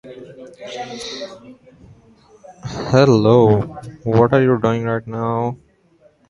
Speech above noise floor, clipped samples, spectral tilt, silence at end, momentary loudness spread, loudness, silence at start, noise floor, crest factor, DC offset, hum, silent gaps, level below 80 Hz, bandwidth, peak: 38 dB; under 0.1%; -7.5 dB/octave; 0.75 s; 23 LU; -16 LUFS; 0.05 s; -54 dBFS; 18 dB; under 0.1%; none; none; -48 dBFS; 11.5 kHz; 0 dBFS